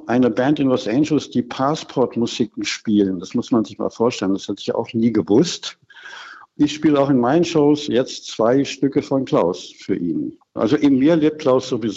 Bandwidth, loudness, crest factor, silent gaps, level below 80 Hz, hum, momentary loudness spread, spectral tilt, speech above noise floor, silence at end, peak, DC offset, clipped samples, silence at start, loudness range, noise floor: 8 kHz; -19 LUFS; 14 dB; none; -58 dBFS; none; 10 LU; -6 dB/octave; 21 dB; 0 s; -4 dBFS; under 0.1%; under 0.1%; 0 s; 3 LU; -39 dBFS